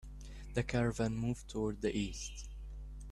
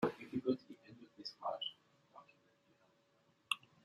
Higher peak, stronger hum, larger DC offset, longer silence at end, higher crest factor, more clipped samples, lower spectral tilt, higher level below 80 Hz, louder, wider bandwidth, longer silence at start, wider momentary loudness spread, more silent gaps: about the same, -20 dBFS vs -18 dBFS; first, 50 Hz at -50 dBFS vs none; neither; second, 0 s vs 0.25 s; second, 18 dB vs 28 dB; neither; first, -6 dB/octave vs -4.5 dB/octave; first, -48 dBFS vs -82 dBFS; first, -38 LUFS vs -43 LUFS; second, 12.5 kHz vs 14 kHz; about the same, 0 s vs 0 s; second, 16 LU vs 23 LU; neither